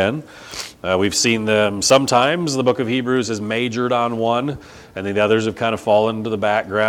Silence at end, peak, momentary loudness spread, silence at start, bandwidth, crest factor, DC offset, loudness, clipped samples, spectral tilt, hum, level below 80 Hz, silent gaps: 0 s; 0 dBFS; 13 LU; 0 s; 19 kHz; 18 dB; under 0.1%; -18 LUFS; under 0.1%; -4 dB/octave; none; -54 dBFS; none